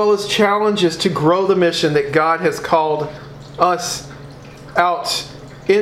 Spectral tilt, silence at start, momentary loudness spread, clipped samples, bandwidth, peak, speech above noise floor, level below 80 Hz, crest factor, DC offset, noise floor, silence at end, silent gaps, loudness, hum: -4.5 dB/octave; 0 s; 19 LU; under 0.1%; 15.5 kHz; 0 dBFS; 20 dB; -50 dBFS; 18 dB; under 0.1%; -36 dBFS; 0 s; none; -17 LUFS; none